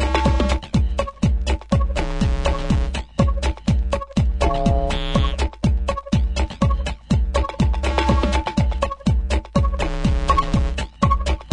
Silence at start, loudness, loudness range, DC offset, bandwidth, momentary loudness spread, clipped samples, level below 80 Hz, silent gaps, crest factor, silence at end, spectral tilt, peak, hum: 0 s; -21 LUFS; 1 LU; under 0.1%; 10.5 kHz; 4 LU; under 0.1%; -22 dBFS; none; 16 dB; 0 s; -6.5 dB/octave; -2 dBFS; none